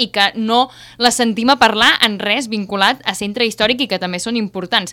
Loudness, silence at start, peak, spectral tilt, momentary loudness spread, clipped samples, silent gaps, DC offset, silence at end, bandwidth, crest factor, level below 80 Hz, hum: -15 LUFS; 0 s; 0 dBFS; -2.5 dB/octave; 9 LU; 0.1%; none; under 0.1%; 0 s; 19 kHz; 16 dB; -50 dBFS; none